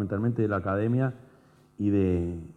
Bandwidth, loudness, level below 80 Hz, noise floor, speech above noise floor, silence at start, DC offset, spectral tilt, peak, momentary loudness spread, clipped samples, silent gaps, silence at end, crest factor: 8.6 kHz; -27 LUFS; -58 dBFS; -58 dBFS; 31 dB; 0 s; under 0.1%; -10.5 dB/octave; -14 dBFS; 6 LU; under 0.1%; none; 0.05 s; 14 dB